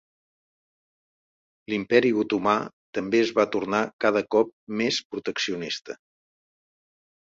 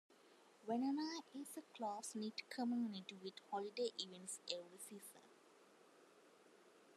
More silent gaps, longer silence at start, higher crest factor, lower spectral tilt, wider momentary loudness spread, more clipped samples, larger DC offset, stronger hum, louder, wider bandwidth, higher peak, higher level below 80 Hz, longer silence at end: first, 2.73-2.93 s, 3.93-3.99 s, 4.53-4.67 s, 5.05-5.10 s vs none; first, 1.7 s vs 0.1 s; about the same, 22 dB vs 24 dB; about the same, -4.5 dB/octave vs -3.5 dB/octave; second, 11 LU vs 17 LU; neither; neither; neither; first, -25 LUFS vs -47 LUFS; second, 7.8 kHz vs 13.5 kHz; first, -4 dBFS vs -24 dBFS; first, -66 dBFS vs under -90 dBFS; first, 1.3 s vs 0 s